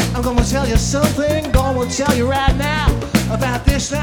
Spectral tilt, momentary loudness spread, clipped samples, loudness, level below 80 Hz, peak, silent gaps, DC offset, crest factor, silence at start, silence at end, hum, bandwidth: -5 dB/octave; 2 LU; under 0.1%; -17 LUFS; -22 dBFS; 0 dBFS; none; under 0.1%; 16 dB; 0 s; 0 s; none; over 20 kHz